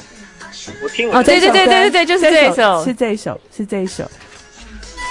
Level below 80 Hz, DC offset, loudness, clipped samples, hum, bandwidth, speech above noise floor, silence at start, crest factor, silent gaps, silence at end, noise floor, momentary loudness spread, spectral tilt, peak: -44 dBFS; under 0.1%; -12 LUFS; under 0.1%; none; 11.5 kHz; 25 dB; 0.2 s; 14 dB; none; 0 s; -38 dBFS; 21 LU; -3.5 dB/octave; 0 dBFS